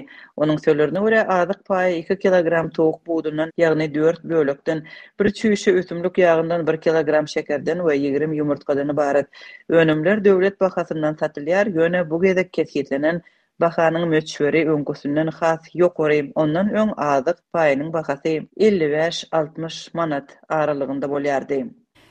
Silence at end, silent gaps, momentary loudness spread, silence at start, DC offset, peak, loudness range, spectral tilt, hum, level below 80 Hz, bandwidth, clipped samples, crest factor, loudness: 0.4 s; none; 7 LU; 0 s; under 0.1%; -4 dBFS; 2 LU; -6.5 dB/octave; none; -60 dBFS; 9.2 kHz; under 0.1%; 16 dB; -20 LUFS